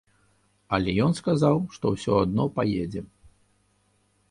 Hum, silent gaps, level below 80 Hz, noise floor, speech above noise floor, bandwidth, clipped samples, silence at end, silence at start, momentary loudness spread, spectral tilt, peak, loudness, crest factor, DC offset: 50 Hz at -50 dBFS; none; -50 dBFS; -67 dBFS; 43 dB; 11.5 kHz; under 0.1%; 1.25 s; 0.7 s; 7 LU; -7 dB/octave; -6 dBFS; -25 LUFS; 20 dB; under 0.1%